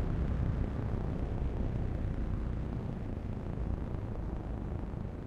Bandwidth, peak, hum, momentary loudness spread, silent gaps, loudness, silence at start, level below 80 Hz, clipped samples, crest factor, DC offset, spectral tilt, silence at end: 6.6 kHz; -20 dBFS; none; 5 LU; none; -37 LUFS; 0 s; -38 dBFS; under 0.1%; 16 dB; under 0.1%; -9.5 dB/octave; 0 s